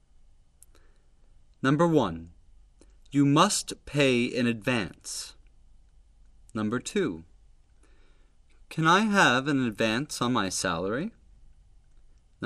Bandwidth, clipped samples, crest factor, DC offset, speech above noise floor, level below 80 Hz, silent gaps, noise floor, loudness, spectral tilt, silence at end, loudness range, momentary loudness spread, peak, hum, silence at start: 13 kHz; under 0.1%; 22 dB; under 0.1%; 32 dB; -56 dBFS; none; -57 dBFS; -26 LUFS; -4.5 dB/octave; 0 s; 10 LU; 15 LU; -6 dBFS; none; 1.65 s